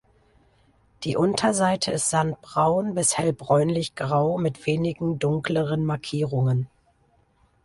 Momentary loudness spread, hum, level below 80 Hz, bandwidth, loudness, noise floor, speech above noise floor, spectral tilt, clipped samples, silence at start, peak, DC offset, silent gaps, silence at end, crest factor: 5 LU; none; -56 dBFS; 11.5 kHz; -24 LUFS; -63 dBFS; 40 dB; -5 dB/octave; under 0.1%; 1 s; -8 dBFS; under 0.1%; none; 1 s; 18 dB